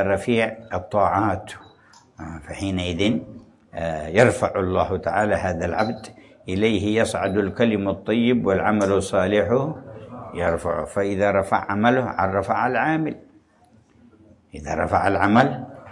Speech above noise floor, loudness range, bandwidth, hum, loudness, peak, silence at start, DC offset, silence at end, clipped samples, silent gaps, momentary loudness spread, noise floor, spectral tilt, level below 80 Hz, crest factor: 35 dB; 3 LU; 11.5 kHz; none; -22 LUFS; -2 dBFS; 0 s; under 0.1%; 0 s; under 0.1%; none; 18 LU; -56 dBFS; -6 dB/octave; -52 dBFS; 20 dB